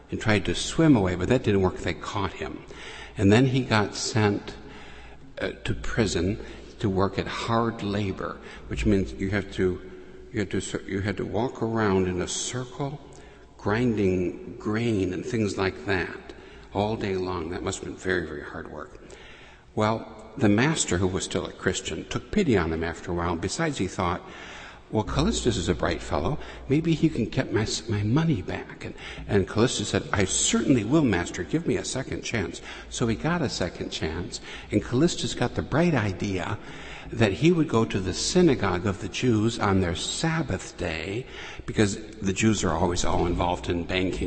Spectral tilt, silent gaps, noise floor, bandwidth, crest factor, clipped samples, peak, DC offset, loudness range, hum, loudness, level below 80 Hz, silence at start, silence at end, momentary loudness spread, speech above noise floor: -5 dB/octave; none; -48 dBFS; 8.8 kHz; 20 dB; under 0.1%; -6 dBFS; under 0.1%; 4 LU; none; -26 LUFS; -42 dBFS; 0 s; 0 s; 14 LU; 22 dB